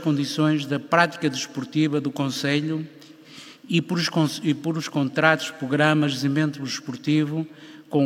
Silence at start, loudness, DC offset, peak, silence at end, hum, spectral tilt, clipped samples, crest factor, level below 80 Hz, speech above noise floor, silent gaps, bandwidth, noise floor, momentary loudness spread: 0 s; -23 LUFS; under 0.1%; -2 dBFS; 0 s; none; -5.5 dB/octave; under 0.1%; 22 dB; -76 dBFS; 22 dB; none; 16 kHz; -45 dBFS; 10 LU